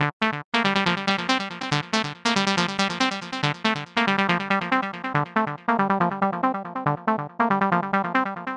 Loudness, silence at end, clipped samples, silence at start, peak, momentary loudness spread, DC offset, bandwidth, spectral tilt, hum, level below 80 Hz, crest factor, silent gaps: -23 LUFS; 0 s; under 0.1%; 0 s; -4 dBFS; 5 LU; under 0.1%; 11 kHz; -4.5 dB/octave; none; -64 dBFS; 20 dB; 0.13-0.20 s, 0.44-0.52 s